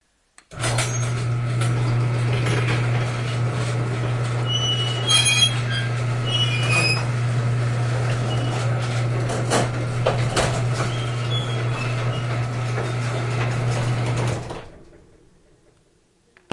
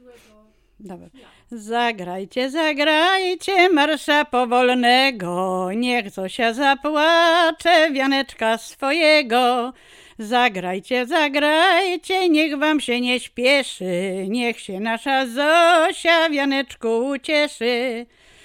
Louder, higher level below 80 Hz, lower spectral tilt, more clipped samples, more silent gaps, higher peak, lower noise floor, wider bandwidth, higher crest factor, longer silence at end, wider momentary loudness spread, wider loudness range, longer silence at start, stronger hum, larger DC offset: second, -22 LUFS vs -18 LUFS; first, -44 dBFS vs -60 dBFS; about the same, -4.5 dB/octave vs -3.5 dB/octave; neither; neither; about the same, -6 dBFS vs -4 dBFS; first, -60 dBFS vs -54 dBFS; second, 11.5 kHz vs 16.5 kHz; about the same, 18 dB vs 16 dB; first, 1.7 s vs 0.4 s; second, 6 LU vs 9 LU; first, 6 LU vs 3 LU; second, 0.5 s vs 0.8 s; neither; neither